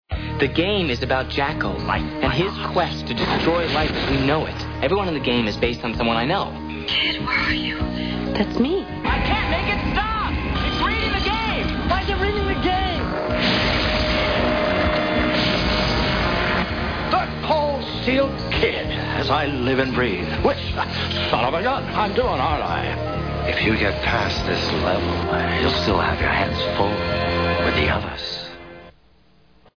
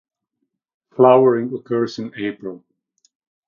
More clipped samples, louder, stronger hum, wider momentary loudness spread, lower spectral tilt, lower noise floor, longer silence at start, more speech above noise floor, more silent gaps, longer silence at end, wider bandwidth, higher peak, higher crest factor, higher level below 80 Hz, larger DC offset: neither; second, -21 LUFS vs -17 LUFS; neither; second, 5 LU vs 21 LU; second, -6 dB/octave vs -7.5 dB/octave; second, -56 dBFS vs -76 dBFS; second, 0.1 s vs 1 s; second, 35 dB vs 59 dB; neither; about the same, 0.85 s vs 0.9 s; second, 5.4 kHz vs 7 kHz; second, -4 dBFS vs 0 dBFS; about the same, 16 dB vs 20 dB; first, -32 dBFS vs -70 dBFS; first, 0.1% vs under 0.1%